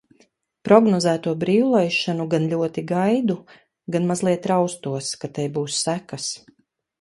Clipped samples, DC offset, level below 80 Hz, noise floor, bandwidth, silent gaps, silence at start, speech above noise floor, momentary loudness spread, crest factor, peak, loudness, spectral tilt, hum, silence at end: under 0.1%; under 0.1%; -64 dBFS; -61 dBFS; 11.5 kHz; none; 0.65 s; 40 dB; 12 LU; 22 dB; 0 dBFS; -21 LUFS; -5 dB/octave; none; 0.65 s